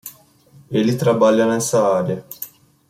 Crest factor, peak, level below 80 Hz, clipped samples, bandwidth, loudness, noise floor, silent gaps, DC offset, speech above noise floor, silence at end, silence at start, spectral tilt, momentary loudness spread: 16 dB; -4 dBFS; -60 dBFS; under 0.1%; 16.5 kHz; -17 LUFS; -50 dBFS; none; under 0.1%; 33 dB; 0.45 s; 0.05 s; -5.5 dB/octave; 18 LU